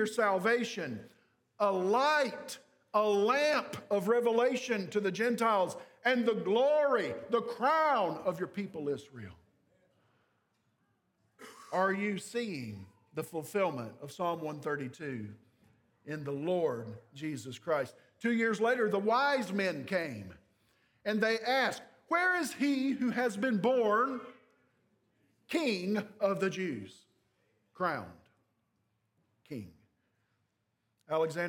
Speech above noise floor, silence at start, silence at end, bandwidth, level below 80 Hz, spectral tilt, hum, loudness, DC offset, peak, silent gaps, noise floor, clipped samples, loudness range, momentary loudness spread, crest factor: 49 dB; 0 s; 0 s; 18 kHz; -82 dBFS; -5 dB/octave; none; -32 LUFS; under 0.1%; -14 dBFS; none; -81 dBFS; under 0.1%; 10 LU; 16 LU; 18 dB